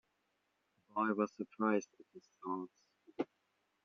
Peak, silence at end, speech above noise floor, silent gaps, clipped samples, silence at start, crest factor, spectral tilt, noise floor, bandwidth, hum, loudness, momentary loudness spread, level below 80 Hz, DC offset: -20 dBFS; 0.6 s; 43 dB; none; under 0.1%; 0.95 s; 22 dB; -6 dB/octave; -82 dBFS; 6.8 kHz; none; -39 LUFS; 16 LU; -90 dBFS; under 0.1%